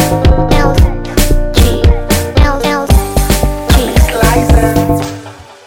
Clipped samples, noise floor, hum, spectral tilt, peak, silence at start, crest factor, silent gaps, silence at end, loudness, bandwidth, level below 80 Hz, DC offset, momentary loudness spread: under 0.1%; -30 dBFS; none; -5.5 dB/octave; 0 dBFS; 0 s; 10 dB; none; 0.15 s; -11 LUFS; 17 kHz; -12 dBFS; under 0.1%; 5 LU